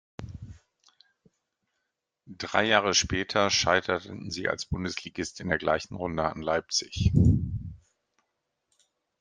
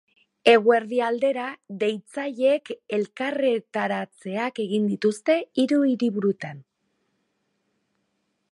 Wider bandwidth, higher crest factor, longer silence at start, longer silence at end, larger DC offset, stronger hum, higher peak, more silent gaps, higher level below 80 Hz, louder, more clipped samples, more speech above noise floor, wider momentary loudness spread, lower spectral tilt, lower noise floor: second, 10 kHz vs 11.5 kHz; about the same, 24 dB vs 22 dB; second, 0.2 s vs 0.45 s; second, 1.45 s vs 1.9 s; neither; neither; about the same, -4 dBFS vs -4 dBFS; neither; first, -46 dBFS vs -76 dBFS; second, -27 LUFS vs -24 LUFS; neither; first, 56 dB vs 51 dB; first, 16 LU vs 12 LU; second, -4 dB/octave vs -5.5 dB/octave; first, -82 dBFS vs -74 dBFS